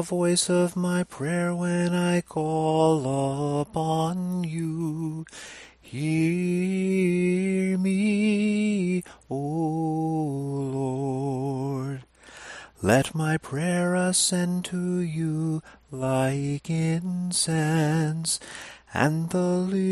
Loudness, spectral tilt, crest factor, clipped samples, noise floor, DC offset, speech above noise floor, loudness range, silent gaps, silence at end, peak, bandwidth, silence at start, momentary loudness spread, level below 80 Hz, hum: -25 LUFS; -5.5 dB/octave; 20 dB; under 0.1%; -46 dBFS; under 0.1%; 21 dB; 4 LU; none; 0 s; -4 dBFS; 13 kHz; 0 s; 10 LU; -60 dBFS; none